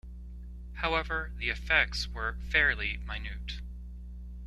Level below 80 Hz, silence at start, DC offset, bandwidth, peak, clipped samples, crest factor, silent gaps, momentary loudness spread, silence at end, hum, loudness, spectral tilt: -40 dBFS; 0.05 s; under 0.1%; 12 kHz; -10 dBFS; under 0.1%; 24 dB; none; 20 LU; 0 s; 60 Hz at -40 dBFS; -30 LUFS; -4 dB/octave